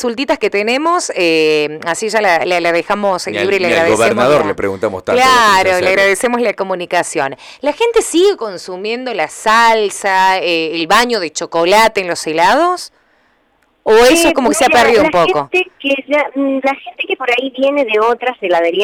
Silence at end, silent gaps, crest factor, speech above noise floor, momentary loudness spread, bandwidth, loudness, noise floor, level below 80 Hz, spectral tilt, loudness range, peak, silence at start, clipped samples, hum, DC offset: 0 s; none; 10 dB; 44 dB; 9 LU; 19 kHz; -12 LUFS; -57 dBFS; -46 dBFS; -3 dB/octave; 3 LU; -2 dBFS; 0 s; under 0.1%; none; under 0.1%